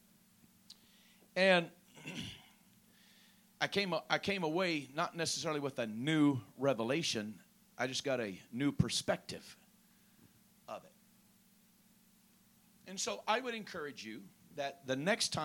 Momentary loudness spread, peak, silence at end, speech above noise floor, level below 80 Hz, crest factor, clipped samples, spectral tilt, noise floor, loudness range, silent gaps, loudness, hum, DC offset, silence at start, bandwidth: 18 LU; -16 dBFS; 0 s; 32 dB; -70 dBFS; 24 dB; under 0.1%; -4 dB/octave; -68 dBFS; 8 LU; none; -36 LUFS; none; under 0.1%; 0.7 s; 17.5 kHz